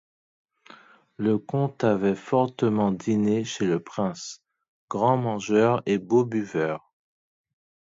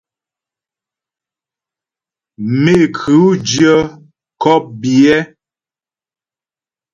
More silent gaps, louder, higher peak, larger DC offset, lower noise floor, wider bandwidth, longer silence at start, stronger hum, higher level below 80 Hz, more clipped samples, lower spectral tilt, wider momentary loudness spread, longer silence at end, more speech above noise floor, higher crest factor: first, 4.68-4.88 s vs none; second, -25 LUFS vs -12 LUFS; second, -6 dBFS vs 0 dBFS; neither; second, -52 dBFS vs under -90 dBFS; second, 7.8 kHz vs 9.2 kHz; second, 0.7 s vs 2.4 s; neither; second, -64 dBFS vs -50 dBFS; neither; about the same, -6.5 dB/octave vs -5.5 dB/octave; about the same, 7 LU vs 9 LU; second, 1.05 s vs 1.7 s; second, 28 dB vs over 79 dB; about the same, 18 dB vs 16 dB